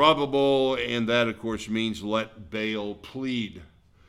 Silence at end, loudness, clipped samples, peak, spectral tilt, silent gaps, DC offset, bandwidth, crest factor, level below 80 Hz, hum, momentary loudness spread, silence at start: 0.45 s; -26 LUFS; under 0.1%; -4 dBFS; -5 dB/octave; none; under 0.1%; 13 kHz; 22 dB; -54 dBFS; none; 11 LU; 0 s